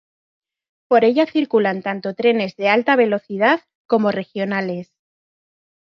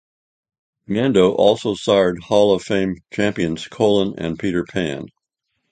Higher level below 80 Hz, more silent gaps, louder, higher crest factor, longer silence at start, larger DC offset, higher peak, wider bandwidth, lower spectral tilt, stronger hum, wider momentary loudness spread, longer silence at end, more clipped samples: second, -70 dBFS vs -50 dBFS; first, 3.75-3.89 s vs none; about the same, -18 LUFS vs -19 LUFS; about the same, 16 dB vs 18 dB; about the same, 0.9 s vs 0.9 s; neither; about the same, -2 dBFS vs 0 dBFS; second, 6.2 kHz vs 9.4 kHz; about the same, -7 dB/octave vs -6 dB/octave; neither; about the same, 9 LU vs 9 LU; first, 1.05 s vs 0.65 s; neither